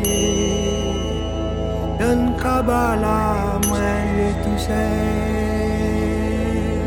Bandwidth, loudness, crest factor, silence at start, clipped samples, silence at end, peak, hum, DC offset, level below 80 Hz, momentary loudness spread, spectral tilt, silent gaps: 18 kHz; -20 LUFS; 14 dB; 0 s; under 0.1%; 0 s; -6 dBFS; none; under 0.1%; -28 dBFS; 5 LU; -5.5 dB/octave; none